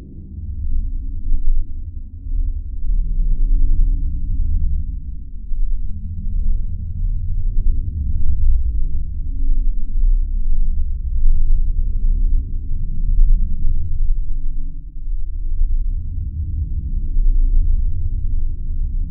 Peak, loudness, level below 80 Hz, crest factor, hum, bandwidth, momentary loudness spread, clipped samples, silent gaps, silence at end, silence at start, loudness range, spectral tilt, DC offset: -2 dBFS; -25 LUFS; -16 dBFS; 14 dB; none; 0.4 kHz; 9 LU; under 0.1%; none; 0 s; 0 s; 3 LU; -16 dB/octave; under 0.1%